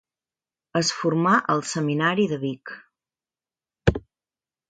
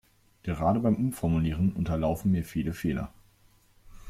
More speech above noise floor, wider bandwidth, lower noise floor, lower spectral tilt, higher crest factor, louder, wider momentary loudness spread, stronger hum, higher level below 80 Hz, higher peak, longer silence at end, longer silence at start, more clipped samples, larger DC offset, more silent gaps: first, over 67 dB vs 34 dB; second, 9.4 kHz vs 15.5 kHz; first, under -90 dBFS vs -61 dBFS; second, -5 dB/octave vs -8 dB/octave; first, 22 dB vs 16 dB; first, -23 LUFS vs -28 LUFS; first, 17 LU vs 10 LU; neither; about the same, -44 dBFS vs -46 dBFS; first, -2 dBFS vs -12 dBFS; first, 0.7 s vs 0 s; first, 0.75 s vs 0.45 s; neither; neither; neither